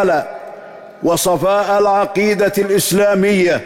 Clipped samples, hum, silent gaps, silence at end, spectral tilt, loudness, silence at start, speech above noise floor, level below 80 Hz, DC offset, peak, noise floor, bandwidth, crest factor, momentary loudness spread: under 0.1%; none; none; 0 s; -4.5 dB/octave; -14 LUFS; 0 s; 21 dB; -48 dBFS; under 0.1%; -6 dBFS; -35 dBFS; 16.5 kHz; 10 dB; 15 LU